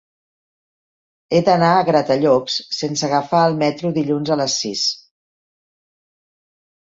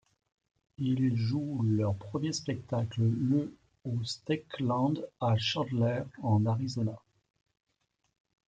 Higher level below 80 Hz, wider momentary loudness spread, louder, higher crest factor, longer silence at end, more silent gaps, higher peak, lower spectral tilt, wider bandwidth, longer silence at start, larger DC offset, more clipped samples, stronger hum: first, -60 dBFS vs -66 dBFS; about the same, 7 LU vs 7 LU; first, -17 LUFS vs -31 LUFS; about the same, 18 dB vs 16 dB; first, 1.95 s vs 1.5 s; neither; first, -2 dBFS vs -16 dBFS; second, -4.5 dB/octave vs -6.5 dB/octave; second, 7.8 kHz vs 9 kHz; first, 1.3 s vs 0.8 s; neither; neither; neither